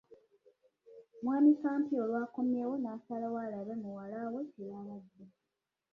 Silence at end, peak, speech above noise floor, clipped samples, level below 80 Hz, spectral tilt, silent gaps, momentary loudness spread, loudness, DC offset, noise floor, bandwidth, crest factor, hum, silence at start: 0.65 s; -16 dBFS; 54 dB; under 0.1%; -82 dBFS; -9.5 dB/octave; none; 18 LU; -35 LUFS; under 0.1%; -88 dBFS; 2.8 kHz; 18 dB; none; 0.9 s